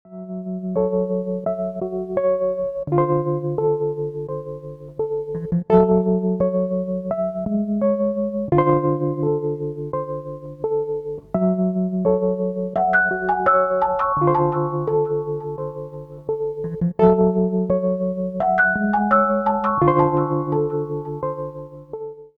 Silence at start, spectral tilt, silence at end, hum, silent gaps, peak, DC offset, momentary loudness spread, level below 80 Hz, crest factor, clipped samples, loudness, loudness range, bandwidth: 0.05 s; -11 dB/octave; 0.1 s; none; none; -2 dBFS; under 0.1%; 12 LU; -48 dBFS; 20 dB; under 0.1%; -21 LUFS; 4 LU; 3.9 kHz